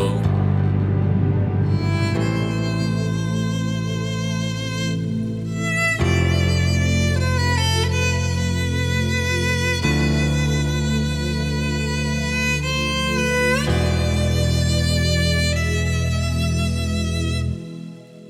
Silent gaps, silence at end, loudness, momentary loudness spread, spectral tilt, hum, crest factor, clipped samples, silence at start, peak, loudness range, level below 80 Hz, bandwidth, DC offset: none; 0 s; -20 LUFS; 5 LU; -5 dB/octave; none; 14 dB; under 0.1%; 0 s; -6 dBFS; 3 LU; -34 dBFS; 15 kHz; under 0.1%